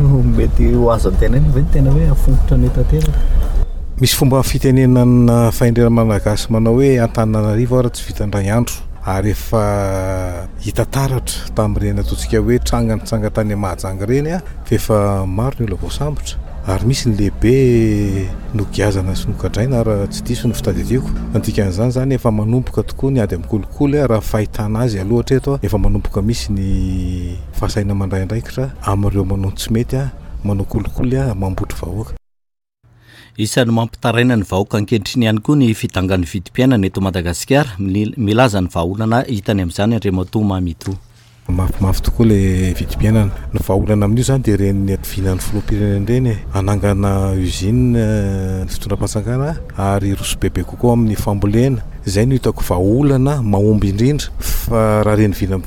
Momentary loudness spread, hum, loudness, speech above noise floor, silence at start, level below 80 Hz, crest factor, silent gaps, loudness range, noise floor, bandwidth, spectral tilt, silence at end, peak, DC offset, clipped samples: 9 LU; none; -16 LUFS; 34 dB; 0 s; -22 dBFS; 14 dB; none; 5 LU; -49 dBFS; 18 kHz; -6.5 dB/octave; 0 s; -2 dBFS; under 0.1%; under 0.1%